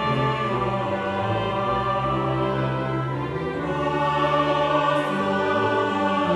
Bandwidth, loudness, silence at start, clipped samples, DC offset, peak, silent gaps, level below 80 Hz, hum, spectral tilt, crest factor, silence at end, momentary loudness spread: 11 kHz; -23 LUFS; 0 s; under 0.1%; under 0.1%; -8 dBFS; none; -46 dBFS; none; -7 dB/octave; 14 dB; 0 s; 5 LU